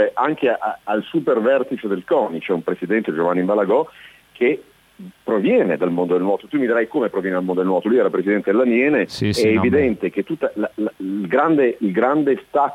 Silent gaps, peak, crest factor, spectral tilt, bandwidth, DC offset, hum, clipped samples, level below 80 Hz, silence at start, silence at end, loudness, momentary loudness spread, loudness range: none; -4 dBFS; 14 dB; -7 dB/octave; 15 kHz; under 0.1%; none; under 0.1%; -56 dBFS; 0 s; 0 s; -19 LUFS; 7 LU; 3 LU